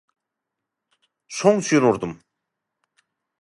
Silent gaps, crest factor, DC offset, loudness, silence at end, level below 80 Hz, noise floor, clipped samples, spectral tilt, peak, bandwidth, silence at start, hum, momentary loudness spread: none; 22 dB; under 0.1%; -19 LUFS; 1.25 s; -62 dBFS; -83 dBFS; under 0.1%; -5 dB/octave; -2 dBFS; 11.5 kHz; 1.3 s; none; 15 LU